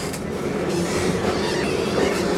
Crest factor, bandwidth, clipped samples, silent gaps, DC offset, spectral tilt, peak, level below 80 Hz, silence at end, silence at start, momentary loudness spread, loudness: 14 dB; 16 kHz; under 0.1%; none; under 0.1%; -5 dB/octave; -8 dBFS; -42 dBFS; 0 s; 0 s; 5 LU; -23 LUFS